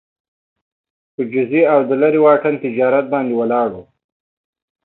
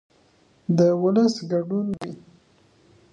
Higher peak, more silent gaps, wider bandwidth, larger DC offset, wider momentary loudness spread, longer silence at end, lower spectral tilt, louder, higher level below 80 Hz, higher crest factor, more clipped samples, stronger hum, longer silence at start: first, 0 dBFS vs -8 dBFS; neither; second, 4.1 kHz vs 9.4 kHz; neither; second, 11 LU vs 18 LU; about the same, 1.05 s vs 1 s; first, -11.5 dB/octave vs -7.5 dB/octave; first, -15 LUFS vs -22 LUFS; about the same, -64 dBFS vs -66 dBFS; about the same, 16 dB vs 16 dB; neither; neither; first, 1.2 s vs 0.7 s